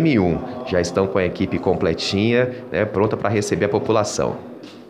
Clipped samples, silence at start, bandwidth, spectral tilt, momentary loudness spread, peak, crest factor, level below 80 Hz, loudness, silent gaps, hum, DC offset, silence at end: under 0.1%; 0 s; 13.5 kHz; -5.5 dB/octave; 5 LU; -4 dBFS; 16 dB; -46 dBFS; -20 LUFS; none; none; under 0.1%; 0 s